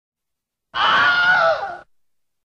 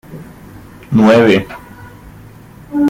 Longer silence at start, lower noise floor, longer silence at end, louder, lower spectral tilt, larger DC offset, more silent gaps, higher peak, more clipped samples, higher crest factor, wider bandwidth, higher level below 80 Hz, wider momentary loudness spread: first, 0.75 s vs 0.1 s; first, -80 dBFS vs -37 dBFS; first, 0.65 s vs 0 s; second, -16 LUFS vs -11 LUFS; second, -2.5 dB/octave vs -7 dB/octave; neither; neither; second, -6 dBFS vs -2 dBFS; neither; about the same, 14 dB vs 14 dB; second, 8.4 kHz vs 16 kHz; second, -58 dBFS vs -44 dBFS; second, 15 LU vs 25 LU